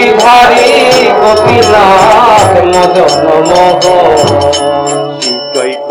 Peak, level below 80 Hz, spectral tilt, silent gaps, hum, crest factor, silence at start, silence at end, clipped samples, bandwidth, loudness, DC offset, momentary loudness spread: 0 dBFS; -36 dBFS; -3.5 dB/octave; none; none; 6 dB; 0 s; 0 s; 10%; over 20 kHz; -5 LUFS; under 0.1%; 9 LU